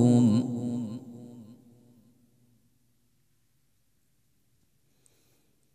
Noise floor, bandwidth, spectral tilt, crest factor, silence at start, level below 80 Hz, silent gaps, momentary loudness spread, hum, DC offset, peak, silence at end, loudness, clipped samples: -73 dBFS; 10.5 kHz; -8.5 dB/octave; 20 dB; 0 s; -78 dBFS; none; 26 LU; none; under 0.1%; -10 dBFS; 4.2 s; -27 LUFS; under 0.1%